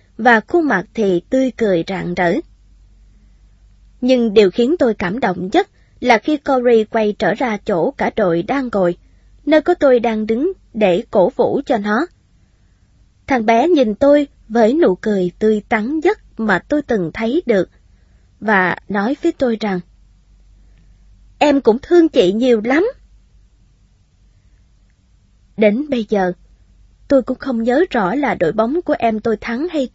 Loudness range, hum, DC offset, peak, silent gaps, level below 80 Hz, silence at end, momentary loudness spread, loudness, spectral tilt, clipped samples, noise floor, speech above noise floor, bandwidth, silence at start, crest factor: 5 LU; none; under 0.1%; 0 dBFS; none; -46 dBFS; 0.05 s; 7 LU; -16 LUFS; -6.5 dB/octave; under 0.1%; -53 dBFS; 38 dB; 8 kHz; 0.2 s; 16 dB